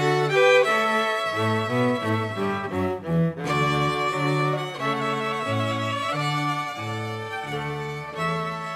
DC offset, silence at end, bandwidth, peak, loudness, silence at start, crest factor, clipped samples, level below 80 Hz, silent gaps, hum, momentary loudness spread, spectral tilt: under 0.1%; 0 s; 15.5 kHz; -6 dBFS; -24 LUFS; 0 s; 18 dB; under 0.1%; -58 dBFS; none; none; 10 LU; -5.5 dB/octave